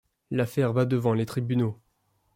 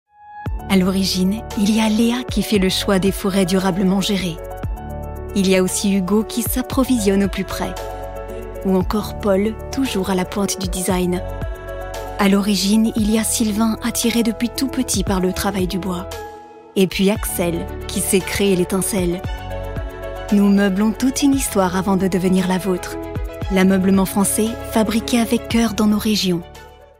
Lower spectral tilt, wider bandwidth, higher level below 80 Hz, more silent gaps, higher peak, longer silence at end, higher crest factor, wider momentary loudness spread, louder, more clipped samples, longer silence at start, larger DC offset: first, -8 dB/octave vs -5 dB/octave; about the same, 16 kHz vs 16.5 kHz; second, -64 dBFS vs -34 dBFS; neither; second, -10 dBFS vs -4 dBFS; first, 0.6 s vs 0.15 s; about the same, 16 dB vs 16 dB; second, 7 LU vs 13 LU; second, -27 LUFS vs -19 LUFS; neither; about the same, 0.3 s vs 0.2 s; neither